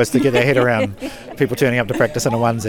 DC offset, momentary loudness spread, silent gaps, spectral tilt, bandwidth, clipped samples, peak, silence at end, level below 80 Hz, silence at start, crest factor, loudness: under 0.1%; 9 LU; none; -5.5 dB/octave; 19.5 kHz; under 0.1%; -2 dBFS; 0 s; -46 dBFS; 0 s; 14 dB; -17 LUFS